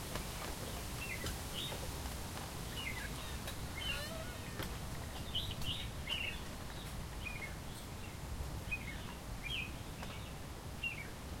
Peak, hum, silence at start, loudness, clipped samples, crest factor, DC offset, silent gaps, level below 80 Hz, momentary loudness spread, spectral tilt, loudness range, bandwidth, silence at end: -22 dBFS; none; 0 s; -43 LUFS; under 0.1%; 20 dB; under 0.1%; none; -50 dBFS; 7 LU; -3.5 dB/octave; 3 LU; 16.5 kHz; 0 s